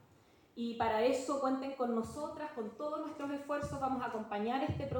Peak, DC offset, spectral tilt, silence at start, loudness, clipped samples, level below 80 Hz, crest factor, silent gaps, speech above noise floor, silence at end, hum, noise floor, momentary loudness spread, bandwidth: -20 dBFS; under 0.1%; -6 dB/octave; 0.55 s; -37 LUFS; under 0.1%; -66 dBFS; 16 dB; none; 29 dB; 0 s; none; -65 dBFS; 10 LU; 17 kHz